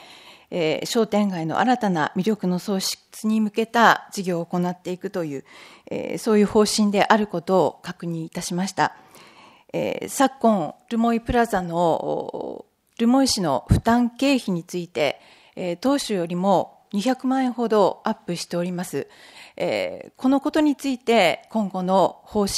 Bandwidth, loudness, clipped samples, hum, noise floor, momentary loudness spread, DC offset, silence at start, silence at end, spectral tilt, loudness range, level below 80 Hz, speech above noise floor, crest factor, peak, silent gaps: 15.5 kHz; -22 LUFS; under 0.1%; none; -50 dBFS; 12 LU; under 0.1%; 0 s; 0 s; -5 dB/octave; 3 LU; -46 dBFS; 28 dB; 22 dB; 0 dBFS; none